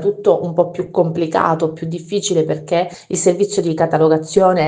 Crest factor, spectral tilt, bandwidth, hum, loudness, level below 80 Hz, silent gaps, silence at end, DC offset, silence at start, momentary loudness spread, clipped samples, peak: 16 dB; -5.5 dB/octave; 10 kHz; none; -17 LUFS; -56 dBFS; none; 0 s; under 0.1%; 0 s; 6 LU; under 0.1%; 0 dBFS